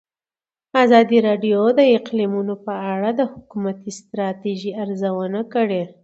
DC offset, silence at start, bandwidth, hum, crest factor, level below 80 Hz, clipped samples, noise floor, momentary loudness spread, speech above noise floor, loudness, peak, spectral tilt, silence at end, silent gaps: under 0.1%; 0.75 s; 8 kHz; none; 18 dB; -66 dBFS; under 0.1%; under -90 dBFS; 12 LU; over 71 dB; -19 LUFS; 0 dBFS; -6.5 dB/octave; 0.15 s; none